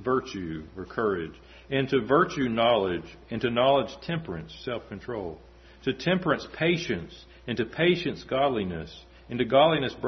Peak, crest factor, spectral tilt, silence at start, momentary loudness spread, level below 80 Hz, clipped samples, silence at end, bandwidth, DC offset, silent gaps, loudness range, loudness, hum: -8 dBFS; 20 dB; -6.5 dB/octave; 0 s; 14 LU; -54 dBFS; under 0.1%; 0 s; 6.4 kHz; under 0.1%; none; 4 LU; -27 LUFS; none